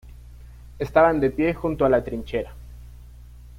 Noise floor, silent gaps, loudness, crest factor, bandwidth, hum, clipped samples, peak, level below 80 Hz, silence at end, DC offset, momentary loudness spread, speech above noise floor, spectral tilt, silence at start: -43 dBFS; none; -22 LUFS; 20 dB; 15.5 kHz; 60 Hz at -40 dBFS; under 0.1%; -4 dBFS; -42 dBFS; 0 s; under 0.1%; 15 LU; 22 dB; -8 dB/octave; 0.05 s